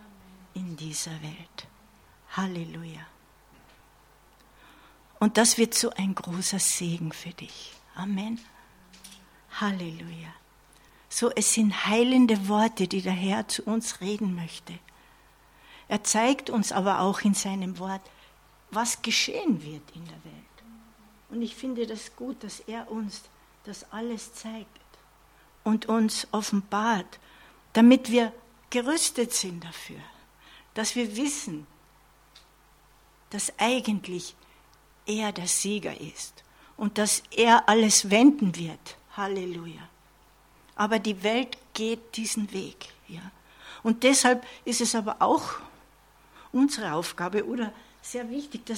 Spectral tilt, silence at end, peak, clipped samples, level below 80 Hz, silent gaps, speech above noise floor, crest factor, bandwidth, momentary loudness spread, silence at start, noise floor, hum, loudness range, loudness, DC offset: -3.5 dB/octave; 0 s; -4 dBFS; under 0.1%; -64 dBFS; none; 32 dB; 24 dB; 17 kHz; 22 LU; 0.4 s; -59 dBFS; none; 13 LU; -26 LUFS; under 0.1%